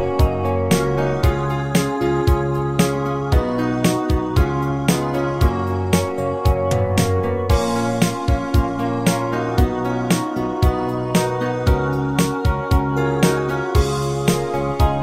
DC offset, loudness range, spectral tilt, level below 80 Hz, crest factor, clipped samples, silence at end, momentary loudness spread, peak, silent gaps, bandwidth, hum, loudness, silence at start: under 0.1%; 1 LU; -6 dB/octave; -26 dBFS; 16 dB; under 0.1%; 0 s; 3 LU; -2 dBFS; none; 16.5 kHz; none; -19 LUFS; 0 s